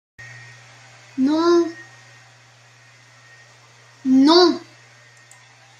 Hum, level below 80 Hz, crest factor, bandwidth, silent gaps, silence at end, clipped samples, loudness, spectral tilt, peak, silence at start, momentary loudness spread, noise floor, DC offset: none; -72 dBFS; 18 dB; 9.6 kHz; none; 1.2 s; under 0.1%; -17 LUFS; -4 dB/octave; -4 dBFS; 0.2 s; 27 LU; -50 dBFS; under 0.1%